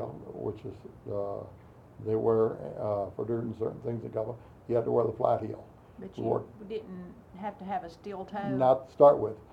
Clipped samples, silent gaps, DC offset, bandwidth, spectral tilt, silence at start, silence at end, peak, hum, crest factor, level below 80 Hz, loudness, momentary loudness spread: under 0.1%; none; under 0.1%; 7 kHz; -9.5 dB/octave; 0 s; 0.1 s; -8 dBFS; none; 22 dB; -62 dBFS; -30 LUFS; 19 LU